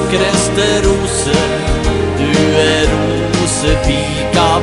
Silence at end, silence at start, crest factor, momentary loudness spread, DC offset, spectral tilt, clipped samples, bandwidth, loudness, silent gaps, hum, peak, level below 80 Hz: 0 s; 0 s; 12 dB; 4 LU; under 0.1%; -4.5 dB/octave; under 0.1%; 11.5 kHz; -13 LUFS; none; none; 0 dBFS; -22 dBFS